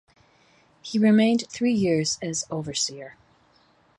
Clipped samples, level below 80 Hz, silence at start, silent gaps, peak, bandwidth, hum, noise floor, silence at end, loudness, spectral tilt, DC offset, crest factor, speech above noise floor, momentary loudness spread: under 0.1%; -64 dBFS; 0.85 s; none; -8 dBFS; 11 kHz; none; -61 dBFS; 0.85 s; -23 LUFS; -4.5 dB/octave; under 0.1%; 16 dB; 38 dB; 17 LU